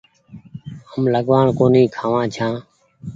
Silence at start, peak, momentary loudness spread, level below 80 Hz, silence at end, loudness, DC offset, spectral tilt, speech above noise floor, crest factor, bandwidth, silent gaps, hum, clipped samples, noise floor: 0.35 s; -2 dBFS; 22 LU; -52 dBFS; 0 s; -17 LUFS; under 0.1%; -8 dB/octave; 27 dB; 18 dB; 7.6 kHz; none; none; under 0.1%; -43 dBFS